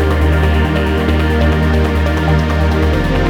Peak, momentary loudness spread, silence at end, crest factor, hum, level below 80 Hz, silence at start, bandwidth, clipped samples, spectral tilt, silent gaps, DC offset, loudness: -2 dBFS; 1 LU; 0 s; 10 dB; none; -16 dBFS; 0 s; 12.5 kHz; under 0.1%; -7.5 dB/octave; none; under 0.1%; -14 LUFS